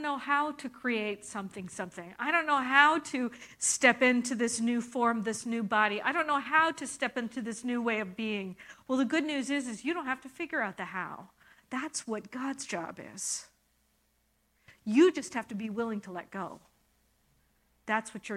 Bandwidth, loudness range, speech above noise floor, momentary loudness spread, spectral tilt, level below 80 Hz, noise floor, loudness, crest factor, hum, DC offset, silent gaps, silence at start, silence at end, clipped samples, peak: 14.5 kHz; 10 LU; 42 dB; 15 LU; -3 dB/octave; -74 dBFS; -73 dBFS; -30 LUFS; 24 dB; none; under 0.1%; none; 0 s; 0 s; under 0.1%; -8 dBFS